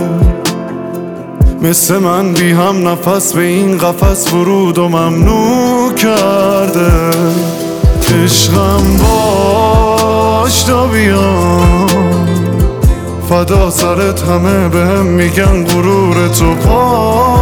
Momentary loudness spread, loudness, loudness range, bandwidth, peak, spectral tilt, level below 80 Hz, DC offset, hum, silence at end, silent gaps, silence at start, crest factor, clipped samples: 4 LU; -10 LUFS; 2 LU; 20 kHz; 0 dBFS; -5 dB/octave; -18 dBFS; under 0.1%; none; 0 s; none; 0 s; 10 dB; under 0.1%